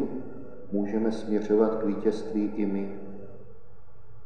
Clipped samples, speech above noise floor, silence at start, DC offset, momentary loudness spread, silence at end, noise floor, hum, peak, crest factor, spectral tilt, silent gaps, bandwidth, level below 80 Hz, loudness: under 0.1%; 28 dB; 0 s; 2%; 20 LU; 0 s; -55 dBFS; none; -10 dBFS; 18 dB; -8 dB/octave; none; 9 kHz; -60 dBFS; -28 LUFS